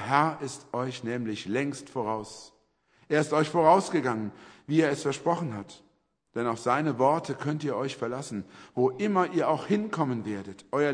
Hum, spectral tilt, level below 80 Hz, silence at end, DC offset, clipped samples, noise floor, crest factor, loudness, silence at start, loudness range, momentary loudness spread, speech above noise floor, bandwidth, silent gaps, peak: none; -6 dB/octave; -70 dBFS; 0 s; under 0.1%; under 0.1%; -66 dBFS; 22 dB; -28 LUFS; 0 s; 3 LU; 13 LU; 38 dB; 10.5 kHz; none; -6 dBFS